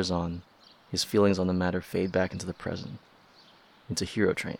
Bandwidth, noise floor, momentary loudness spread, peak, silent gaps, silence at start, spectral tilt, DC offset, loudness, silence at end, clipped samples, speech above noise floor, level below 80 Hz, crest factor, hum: 17.5 kHz; -57 dBFS; 14 LU; -12 dBFS; none; 0 s; -5 dB/octave; under 0.1%; -29 LUFS; 0.05 s; under 0.1%; 29 dB; -56 dBFS; 18 dB; none